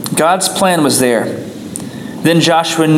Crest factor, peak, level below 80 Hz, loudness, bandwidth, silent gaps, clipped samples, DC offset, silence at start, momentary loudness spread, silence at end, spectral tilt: 12 dB; 0 dBFS; -56 dBFS; -12 LUFS; 17 kHz; none; under 0.1%; under 0.1%; 0 s; 14 LU; 0 s; -4 dB/octave